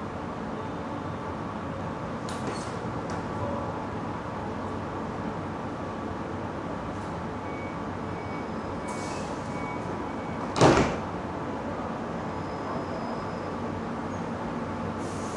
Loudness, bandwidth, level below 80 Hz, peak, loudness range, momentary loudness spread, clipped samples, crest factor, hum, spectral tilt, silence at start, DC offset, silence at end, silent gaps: -32 LUFS; 11.5 kHz; -50 dBFS; -6 dBFS; 6 LU; 3 LU; under 0.1%; 24 dB; none; -6 dB/octave; 0 s; under 0.1%; 0 s; none